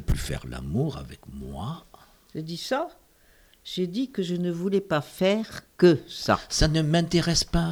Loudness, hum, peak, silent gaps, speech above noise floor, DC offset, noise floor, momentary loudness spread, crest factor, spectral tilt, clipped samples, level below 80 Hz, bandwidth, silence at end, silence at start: -26 LUFS; none; -6 dBFS; none; 33 dB; under 0.1%; -58 dBFS; 17 LU; 20 dB; -5 dB/octave; under 0.1%; -38 dBFS; over 20 kHz; 0 s; 0 s